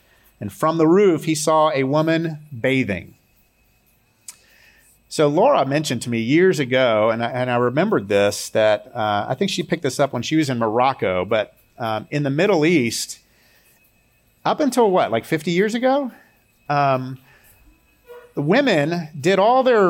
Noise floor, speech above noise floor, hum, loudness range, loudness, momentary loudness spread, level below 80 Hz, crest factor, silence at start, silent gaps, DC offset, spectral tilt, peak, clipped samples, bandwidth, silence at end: -60 dBFS; 42 dB; none; 4 LU; -19 LUFS; 10 LU; -62 dBFS; 14 dB; 0.4 s; none; under 0.1%; -5.5 dB/octave; -6 dBFS; under 0.1%; 17 kHz; 0 s